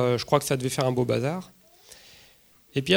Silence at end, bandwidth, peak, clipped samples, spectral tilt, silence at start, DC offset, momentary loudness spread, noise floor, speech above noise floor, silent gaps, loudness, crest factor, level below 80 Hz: 0 s; over 20 kHz; -4 dBFS; under 0.1%; -5 dB/octave; 0 s; under 0.1%; 16 LU; -57 dBFS; 33 dB; none; -26 LUFS; 22 dB; -58 dBFS